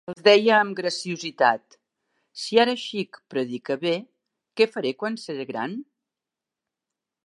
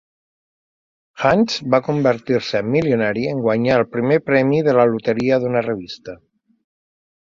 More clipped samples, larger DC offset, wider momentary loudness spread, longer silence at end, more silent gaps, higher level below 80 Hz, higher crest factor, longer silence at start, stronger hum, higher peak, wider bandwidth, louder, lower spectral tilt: neither; neither; first, 15 LU vs 6 LU; first, 1.45 s vs 1.15 s; neither; second, -80 dBFS vs -54 dBFS; about the same, 22 dB vs 18 dB; second, 0.1 s vs 1.15 s; neither; about the same, -2 dBFS vs -2 dBFS; first, 11.5 kHz vs 7.6 kHz; second, -23 LUFS vs -18 LUFS; second, -4 dB/octave vs -6.5 dB/octave